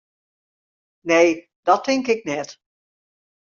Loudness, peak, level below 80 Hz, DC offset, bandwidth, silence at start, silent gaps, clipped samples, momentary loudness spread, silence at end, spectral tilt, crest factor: -20 LUFS; -2 dBFS; -68 dBFS; under 0.1%; 7.4 kHz; 1.05 s; 1.56-1.63 s; under 0.1%; 14 LU; 0.95 s; -2.5 dB/octave; 20 dB